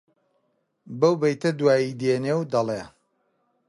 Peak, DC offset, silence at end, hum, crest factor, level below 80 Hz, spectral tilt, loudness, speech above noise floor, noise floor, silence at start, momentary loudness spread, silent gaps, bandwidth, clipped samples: -6 dBFS; under 0.1%; 0.8 s; none; 20 dB; -66 dBFS; -6.5 dB/octave; -23 LUFS; 49 dB; -71 dBFS; 0.85 s; 8 LU; none; 11.5 kHz; under 0.1%